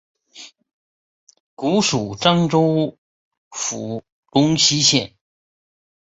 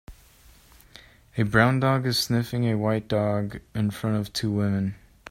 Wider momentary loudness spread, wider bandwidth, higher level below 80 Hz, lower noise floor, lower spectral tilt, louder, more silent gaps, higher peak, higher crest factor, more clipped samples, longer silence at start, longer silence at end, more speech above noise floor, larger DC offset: first, 15 LU vs 9 LU; second, 8.4 kHz vs 16 kHz; about the same, -56 dBFS vs -52 dBFS; second, -44 dBFS vs -54 dBFS; second, -4 dB/octave vs -6 dB/octave; first, -18 LUFS vs -25 LUFS; first, 0.73-1.27 s, 1.40-1.57 s, 2.98-3.31 s, 3.37-3.51 s, 4.12-4.23 s vs none; about the same, -2 dBFS vs -2 dBFS; about the same, 20 dB vs 22 dB; neither; first, 0.35 s vs 0.1 s; first, 0.95 s vs 0.35 s; second, 26 dB vs 30 dB; neither